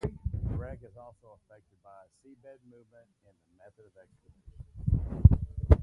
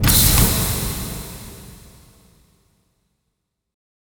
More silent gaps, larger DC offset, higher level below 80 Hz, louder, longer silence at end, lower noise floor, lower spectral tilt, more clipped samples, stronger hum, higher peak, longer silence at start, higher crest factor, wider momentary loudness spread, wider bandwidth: neither; neither; second, -34 dBFS vs -28 dBFS; second, -28 LUFS vs -17 LUFS; second, 0 s vs 2.35 s; second, -57 dBFS vs -76 dBFS; first, -11 dB/octave vs -3 dB/octave; neither; neither; second, -4 dBFS vs 0 dBFS; about the same, 0.05 s vs 0 s; first, 28 dB vs 22 dB; first, 28 LU vs 25 LU; second, 3.7 kHz vs over 20 kHz